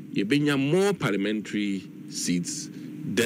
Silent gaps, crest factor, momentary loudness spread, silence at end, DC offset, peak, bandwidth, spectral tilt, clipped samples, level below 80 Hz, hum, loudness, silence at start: none; 18 dB; 12 LU; 0 s; under 0.1%; -8 dBFS; 16 kHz; -4.5 dB/octave; under 0.1%; -68 dBFS; none; -26 LUFS; 0 s